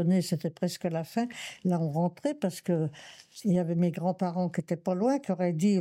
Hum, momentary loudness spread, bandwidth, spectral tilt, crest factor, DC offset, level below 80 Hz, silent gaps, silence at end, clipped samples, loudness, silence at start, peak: none; 6 LU; 14.5 kHz; -7 dB/octave; 14 dB; under 0.1%; -74 dBFS; none; 0 s; under 0.1%; -30 LUFS; 0 s; -16 dBFS